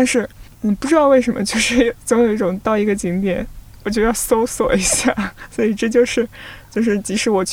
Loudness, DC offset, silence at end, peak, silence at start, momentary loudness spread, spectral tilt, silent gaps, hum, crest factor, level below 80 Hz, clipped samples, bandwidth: -17 LUFS; under 0.1%; 0 s; -2 dBFS; 0 s; 10 LU; -4 dB/octave; none; none; 16 dB; -38 dBFS; under 0.1%; 17 kHz